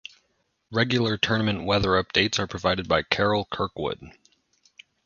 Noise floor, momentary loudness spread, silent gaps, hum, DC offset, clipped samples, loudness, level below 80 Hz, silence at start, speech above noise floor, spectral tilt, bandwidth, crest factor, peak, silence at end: -72 dBFS; 9 LU; none; none; under 0.1%; under 0.1%; -24 LUFS; -48 dBFS; 0.7 s; 47 dB; -5 dB/octave; 7.2 kHz; 22 dB; -4 dBFS; 0.95 s